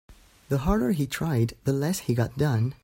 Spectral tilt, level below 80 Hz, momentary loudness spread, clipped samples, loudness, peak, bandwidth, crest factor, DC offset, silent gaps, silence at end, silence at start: -6.5 dB/octave; -42 dBFS; 3 LU; under 0.1%; -26 LUFS; -10 dBFS; 16.5 kHz; 16 dB; under 0.1%; none; 0.1 s; 0.1 s